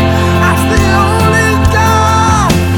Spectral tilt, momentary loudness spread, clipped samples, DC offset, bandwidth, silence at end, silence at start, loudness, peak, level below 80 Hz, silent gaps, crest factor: -5.5 dB/octave; 1 LU; under 0.1%; under 0.1%; 19 kHz; 0 s; 0 s; -9 LUFS; 0 dBFS; -20 dBFS; none; 8 dB